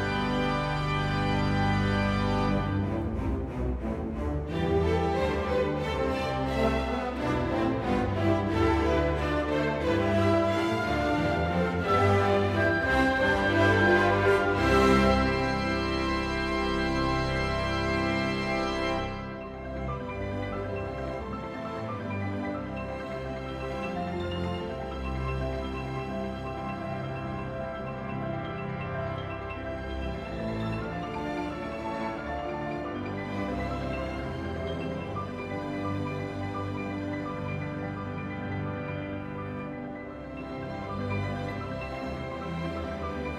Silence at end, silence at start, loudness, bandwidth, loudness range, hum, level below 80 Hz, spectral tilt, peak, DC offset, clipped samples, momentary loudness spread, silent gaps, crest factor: 0 s; 0 s; -29 LUFS; 14 kHz; 10 LU; none; -40 dBFS; -6.5 dB/octave; -10 dBFS; under 0.1%; under 0.1%; 11 LU; none; 20 dB